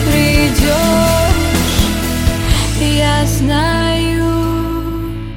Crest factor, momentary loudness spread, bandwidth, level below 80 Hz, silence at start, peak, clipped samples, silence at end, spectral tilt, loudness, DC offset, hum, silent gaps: 12 dB; 6 LU; 17 kHz; -20 dBFS; 0 s; 0 dBFS; under 0.1%; 0 s; -5 dB/octave; -14 LUFS; under 0.1%; none; none